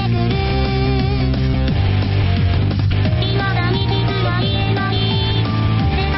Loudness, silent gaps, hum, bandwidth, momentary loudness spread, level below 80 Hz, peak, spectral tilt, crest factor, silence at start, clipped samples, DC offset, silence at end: -17 LUFS; none; none; 5.8 kHz; 1 LU; -24 dBFS; -6 dBFS; -5.5 dB/octave; 10 dB; 0 s; under 0.1%; under 0.1%; 0 s